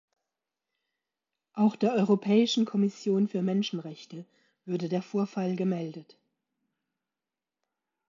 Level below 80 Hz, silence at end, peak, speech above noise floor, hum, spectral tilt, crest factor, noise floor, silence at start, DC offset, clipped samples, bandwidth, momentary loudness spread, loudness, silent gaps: -82 dBFS; 2.05 s; -10 dBFS; over 62 dB; none; -6.5 dB/octave; 20 dB; under -90 dBFS; 1.55 s; under 0.1%; under 0.1%; 7.4 kHz; 18 LU; -28 LUFS; none